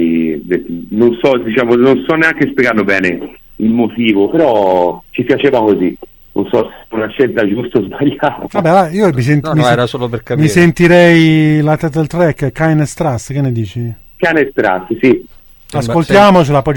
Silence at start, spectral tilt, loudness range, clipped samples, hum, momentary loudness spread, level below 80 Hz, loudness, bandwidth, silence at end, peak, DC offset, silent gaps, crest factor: 0 s; -7 dB/octave; 4 LU; 0.1%; none; 11 LU; -40 dBFS; -12 LUFS; 18 kHz; 0 s; 0 dBFS; under 0.1%; none; 12 dB